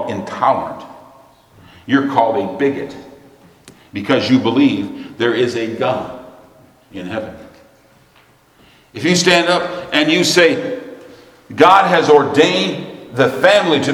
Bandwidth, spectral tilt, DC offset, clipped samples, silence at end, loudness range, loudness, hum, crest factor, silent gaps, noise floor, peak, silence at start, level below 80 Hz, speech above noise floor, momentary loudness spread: 14.5 kHz; -4.5 dB/octave; under 0.1%; under 0.1%; 0 s; 9 LU; -14 LUFS; none; 16 dB; none; -51 dBFS; 0 dBFS; 0 s; -58 dBFS; 37 dB; 20 LU